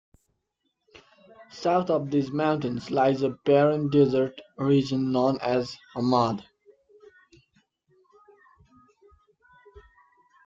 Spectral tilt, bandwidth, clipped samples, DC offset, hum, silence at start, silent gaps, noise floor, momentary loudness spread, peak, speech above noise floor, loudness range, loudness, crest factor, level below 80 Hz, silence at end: -7.5 dB/octave; 7.6 kHz; under 0.1%; under 0.1%; none; 1.4 s; none; -78 dBFS; 9 LU; -8 dBFS; 54 dB; 8 LU; -25 LUFS; 18 dB; -64 dBFS; 0.65 s